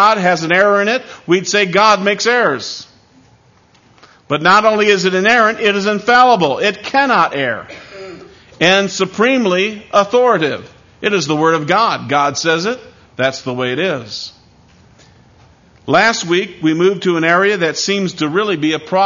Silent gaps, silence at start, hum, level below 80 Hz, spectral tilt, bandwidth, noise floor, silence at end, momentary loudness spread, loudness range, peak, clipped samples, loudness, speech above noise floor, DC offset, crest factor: none; 0 s; none; -58 dBFS; -4 dB/octave; 7.4 kHz; -50 dBFS; 0 s; 11 LU; 6 LU; 0 dBFS; under 0.1%; -13 LUFS; 36 dB; under 0.1%; 14 dB